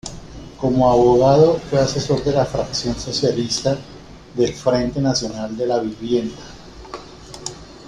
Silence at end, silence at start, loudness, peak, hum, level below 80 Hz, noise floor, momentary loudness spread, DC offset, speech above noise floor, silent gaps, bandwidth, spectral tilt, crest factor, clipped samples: 0 s; 0.05 s; -18 LUFS; -2 dBFS; none; -42 dBFS; -37 dBFS; 22 LU; under 0.1%; 20 dB; none; 11 kHz; -5.5 dB/octave; 18 dB; under 0.1%